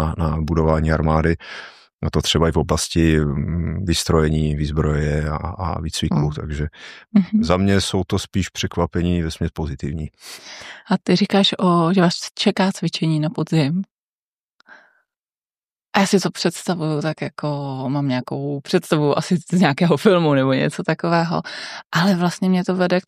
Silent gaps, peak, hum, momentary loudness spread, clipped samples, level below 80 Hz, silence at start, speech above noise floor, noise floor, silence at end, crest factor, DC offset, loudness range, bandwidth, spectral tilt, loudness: 1.93-1.99 s, 13.91-14.59 s, 15.37-15.42 s, 15.64-15.76 s, 21.86-21.90 s; -2 dBFS; none; 10 LU; under 0.1%; -36 dBFS; 0 s; over 71 dB; under -90 dBFS; 0.05 s; 18 dB; under 0.1%; 5 LU; 14.5 kHz; -5.5 dB/octave; -20 LUFS